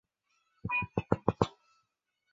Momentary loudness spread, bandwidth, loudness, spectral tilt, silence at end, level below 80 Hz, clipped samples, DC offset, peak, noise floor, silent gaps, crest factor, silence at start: 3 LU; 7.6 kHz; -33 LUFS; -6 dB/octave; 0.85 s; -54 dBFS; under 0.1%; under 0.1%; -10 dBFS; -81 dBFS; none; 26 dB; 0.65 s